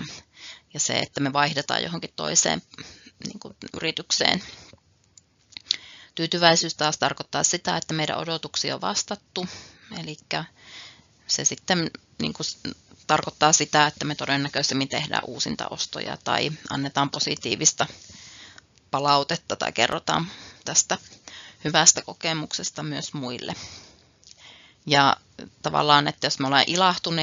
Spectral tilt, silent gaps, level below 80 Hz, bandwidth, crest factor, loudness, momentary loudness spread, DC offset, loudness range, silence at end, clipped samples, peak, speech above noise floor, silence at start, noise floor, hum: -2 dB/octave; none; -64 dBFS; 7.6 kHz; 26 dB; -23 LUFS; 21 LU; under 0.1%; 5 LU; 0 s; under 0.1%; 0 dBFS; 34 dB; 0 s; -58 dBFS; none